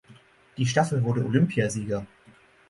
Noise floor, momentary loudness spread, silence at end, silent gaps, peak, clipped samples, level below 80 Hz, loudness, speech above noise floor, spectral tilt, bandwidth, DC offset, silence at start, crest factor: -56 dBFS; 12 LU; 0.65 s; none; -8 dBFS; under 0.1%; -58 dBFS; -25 LUFS; 32 dB; -6 dB/octave; 11.5 kHz; under 0.1%; 0.1 s; 20 dB